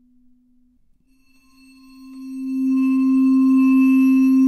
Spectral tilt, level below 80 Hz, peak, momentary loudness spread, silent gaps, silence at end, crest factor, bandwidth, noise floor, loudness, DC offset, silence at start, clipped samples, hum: -5.5 dB/octave; -64 dBFS; -8 dBFS; 16 LU; none; 0 s; 10 dB; 12 kHz; -57 dBFS; -16 LUFS; under 0.1%; 2.05 s; under 0.1%; none